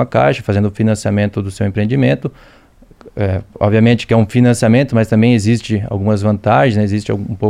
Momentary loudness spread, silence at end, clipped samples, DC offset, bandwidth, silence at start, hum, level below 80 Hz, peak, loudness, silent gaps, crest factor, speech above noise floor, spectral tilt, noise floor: 8 LU; 0 s; under 0.1%; under 0.1%; 12 kHz; 0 s; none; -42 dBFS; 0 dBFS; -14 LUFS; none; 14 dB; 28 dB; -7 dB/octave; -41 dBFS